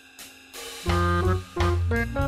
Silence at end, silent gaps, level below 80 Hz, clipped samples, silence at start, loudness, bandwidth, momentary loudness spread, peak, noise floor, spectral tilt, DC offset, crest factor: 0 s; none; -34 dBFS; under 0.1%; 0.2 s; -25 LUFS; 15.5 kHz; 18 LU; -12 dBFS; -47 dBFS; -6 dB/octave; under 0.1%; 12 dB